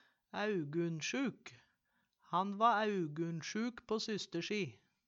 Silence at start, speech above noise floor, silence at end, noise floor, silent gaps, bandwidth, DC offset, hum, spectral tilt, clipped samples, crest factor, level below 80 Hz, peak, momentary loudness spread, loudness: 0.35 s; 44 dB; 0.3 s; -81 dBFS; none; 8 kHz; under 0.1%; none; -5 dB/octave; under 0.1%; 20 dB; -82 dBFS; -18 dBFS; 10 LU; -38 LUFS